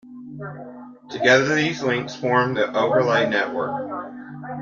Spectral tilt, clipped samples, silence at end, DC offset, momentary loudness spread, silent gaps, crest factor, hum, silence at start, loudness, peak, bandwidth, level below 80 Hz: -5 dB/octave; under 0.1%; 0 s; under 0.1%; 19 LU; none; 20 dB; none; 0.05 s; -20 LUFS; -2 dBFS; 7.4 kHz; -64 dBFS